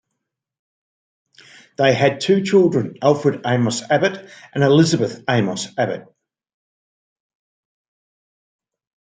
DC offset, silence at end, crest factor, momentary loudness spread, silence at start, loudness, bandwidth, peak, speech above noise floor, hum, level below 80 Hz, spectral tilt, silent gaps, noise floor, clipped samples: under 0.1%; 3.2 s; 18 dB; 9 LU; 1.8 s; -18 LUFS; 9.4 kHz; -2 dBFS; 62 dB; none; -64 dBFS; -5.5 dB/octave; none; -79 dBFS; under 0.1%